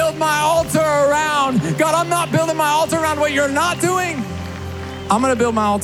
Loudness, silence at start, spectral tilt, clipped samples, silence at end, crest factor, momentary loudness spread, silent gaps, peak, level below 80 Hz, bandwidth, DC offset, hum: -17 LUFS; 0 s; -4.5 dB/octave; under 0.1%; 0 s; 16 dB; 11 LU; none; -2 dBFS; -48 dBFS; over 20 kHz; under 0.1%; none